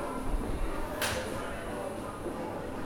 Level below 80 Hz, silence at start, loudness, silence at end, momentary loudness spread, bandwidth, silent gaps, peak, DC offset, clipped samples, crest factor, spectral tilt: -40 dBFS; 0 s; -36 LUFS; 0 s; 6 LU; 16.5 kHz; none; -18 dBFS; under 0.1%; under 0.1%; 16 dB; -4.5 dB/octave